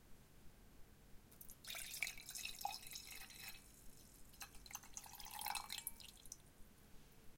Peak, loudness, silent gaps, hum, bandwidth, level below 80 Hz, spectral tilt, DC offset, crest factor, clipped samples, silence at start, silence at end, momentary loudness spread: -26 dBFS; -50 LUFS; none; none; 17 kHz; -66 dBFS; -0.5 dB/octave; under 0.1%; 28 dB; under 0.1%; 0 s; 0 s; 21 LU